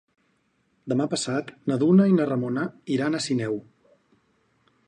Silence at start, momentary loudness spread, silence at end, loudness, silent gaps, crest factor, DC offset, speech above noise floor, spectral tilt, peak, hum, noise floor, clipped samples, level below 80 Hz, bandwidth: 0.85 s; 11 LU; 1.25 s; -24 LUFS; none; 16 dB; under 0.1%; 46 dB; -6 dB/octave; -8 dBFS; none; -69 dBFS; under 0.1%; -70 dBFS; 10 kHz